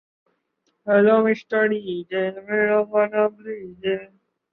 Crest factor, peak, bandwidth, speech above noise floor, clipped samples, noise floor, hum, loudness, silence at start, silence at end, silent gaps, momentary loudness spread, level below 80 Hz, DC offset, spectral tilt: 18 dB; -6 dBFS; 5.8 kHz; 51 dB; under 0.1%; -71 dBFS; none; -21 LUFS; 0.85 s; 0.5 s; none; 13 LU; -68 dBFS; under 0.1%; -8 dB/octave